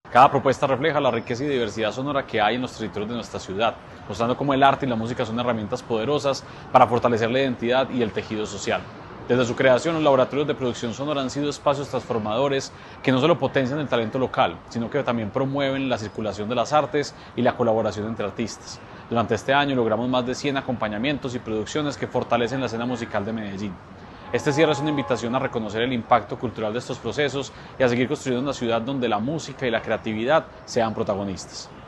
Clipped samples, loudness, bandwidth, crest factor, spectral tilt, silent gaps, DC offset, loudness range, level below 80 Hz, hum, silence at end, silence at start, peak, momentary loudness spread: under 0.1%; -23 LUFS; 11.5 kHz; 22 dB; -5.5 dB/octave; none; under 0.1%; 3 LU; -54 dBFS; none; 0 s; 0.05 s; -2 dBFS; 10 LU